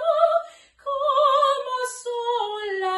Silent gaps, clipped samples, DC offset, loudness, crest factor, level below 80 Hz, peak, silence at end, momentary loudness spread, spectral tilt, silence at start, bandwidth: none; under 0.1%; under 0.1%; -23 LUFS; 16 dB; -70 dBFS; -6 dBFS; 0 s; 11 LU; -0.5 dB/octave; 0 s; 12.5 kHz